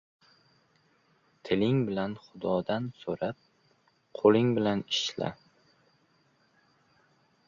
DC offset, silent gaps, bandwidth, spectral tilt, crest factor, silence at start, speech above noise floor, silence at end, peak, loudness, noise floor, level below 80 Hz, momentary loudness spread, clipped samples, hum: under 0.1%; none; 7.4 kHz; -6 dB/octave; 22 dB; 1.45 s; 40 dB; 2.15 s; -8 dBFS; -29 LUFS; -68 dBFS; -66 dBFS; 13 LU; under 0.1%; none